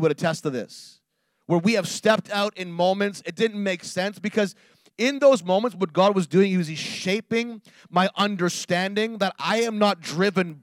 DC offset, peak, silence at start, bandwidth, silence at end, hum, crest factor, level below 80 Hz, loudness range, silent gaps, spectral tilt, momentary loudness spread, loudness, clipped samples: under 0.1%; -6 dBFS; 0 s; 15.5 kHz; 0.05 s; none; 18 dB; -78 dBFS; 2 LU; none; -5 dB/octave; 8 LU; -23 LUFS; under 0.1%